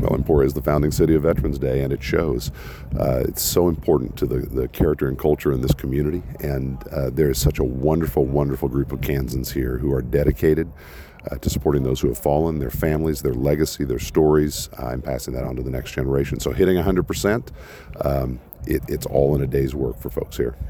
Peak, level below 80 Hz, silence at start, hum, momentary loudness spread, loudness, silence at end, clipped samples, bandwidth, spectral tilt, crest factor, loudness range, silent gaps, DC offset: -4 dBFS; -32 dBFS; 0 s; none; 9 LU; -22 LUFS; 0 s; under 0.1%; over 20 kHz; -6.5 dB/octave; 16 dB; 2 LU; none; under 0.1%